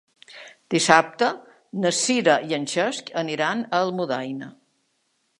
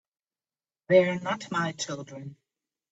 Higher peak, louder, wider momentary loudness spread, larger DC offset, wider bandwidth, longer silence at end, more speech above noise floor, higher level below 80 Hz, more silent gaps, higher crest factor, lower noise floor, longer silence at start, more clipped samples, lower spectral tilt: first, 0 dBFS vs -8 dBFS; first, -22 LUFS vs -26 LUFS; about the same, 20 LU vs 20 LU; neither; first, 11.5 kHz vs 8 kHz; first, 0.9 s vs 0.6 s; second, 48 dB vs over 63 dB; about the same, -74 dBFS vs -70 dBFS; neither; about the same, 24 dB vs 22 dB; second, -70 dBFS vs under -90 dBFS; second, 0.3 s vs 0.9 s; neither; second, -3 dB/octave vs -5 dB/octave